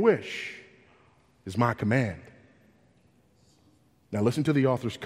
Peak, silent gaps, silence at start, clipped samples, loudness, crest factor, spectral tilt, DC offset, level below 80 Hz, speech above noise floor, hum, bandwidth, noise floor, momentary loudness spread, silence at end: -8 dBFS; none; 0 s; under 0.1%; -28 LUFS; 20 dB; -7 dB/octave; under 0.1%; -62 dBFS; 37 dB; none; 15 kHz; -63 dBFS; 17 LU; 0 s